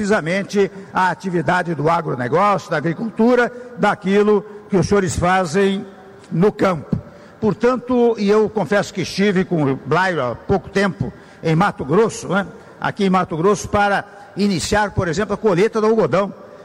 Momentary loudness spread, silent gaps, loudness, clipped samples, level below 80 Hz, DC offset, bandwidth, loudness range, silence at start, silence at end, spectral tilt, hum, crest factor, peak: 7 LU; none; -18 LUFS; under 0.1%; -44 dBFS; under 0.1%; 13 kHz; 2 LU; 0 s; 0 s; -6 dB/octave; none; 12 dB; -6 dBFS